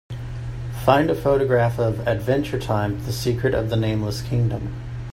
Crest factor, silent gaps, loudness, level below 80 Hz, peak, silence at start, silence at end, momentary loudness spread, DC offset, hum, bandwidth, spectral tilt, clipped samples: 20 dB; none; -22 LUFS; -38 dBFS; -2 dBFS; 0.1 s; 0 s; 13 LU; under 0.1%; none; 16 kHz; -7 dB/octave; under 0.1%